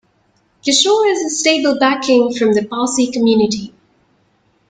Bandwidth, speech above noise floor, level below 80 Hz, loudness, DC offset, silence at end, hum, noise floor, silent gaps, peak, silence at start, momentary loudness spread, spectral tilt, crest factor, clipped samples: 9.6 kHz; 45 dB; -58 dBFS; -14 LUFS; under 0.1%; 1 s; none; -59 dBFS; none; 0 dBFS; 0.65 s; 6 LU; -3 dB/octave; 16 dB; under 0.1%